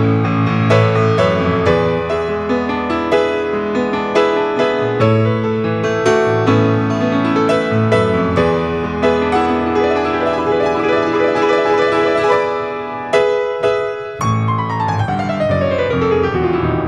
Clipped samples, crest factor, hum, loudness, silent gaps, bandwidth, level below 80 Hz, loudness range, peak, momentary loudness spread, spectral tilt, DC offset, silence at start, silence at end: under 0.1%; 14 dB; none; -15 LUFS; none; 10 kHz; -40 dBFS; 2 LU; 0 dBFS; 5 LU; -7 dB/octave; under 0.1%; 0 s; 0 s